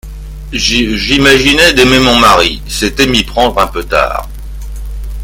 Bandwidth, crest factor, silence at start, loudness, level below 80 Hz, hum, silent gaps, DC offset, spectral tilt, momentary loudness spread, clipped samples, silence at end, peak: over 20 kHz; 10 dB; 0.05 s; -8 LUFS; -22 dBFS; none; none; under 0.1%; -3.5 dB/octave; 20 LU; 0.9%; 0 s; 0 dBFS